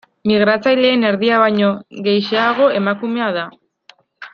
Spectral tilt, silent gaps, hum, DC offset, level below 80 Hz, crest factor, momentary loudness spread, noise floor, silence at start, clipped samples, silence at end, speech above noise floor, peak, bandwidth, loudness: -7 dB/octave; none; none; under 0.1%; -62 dBFS; 14 dB; 7 LU; -50 dBFS; 0.25 s; under 0.1%; 0.05 s; 35 dB; -2 dBFS; 6.6 kHz; -15 LUFS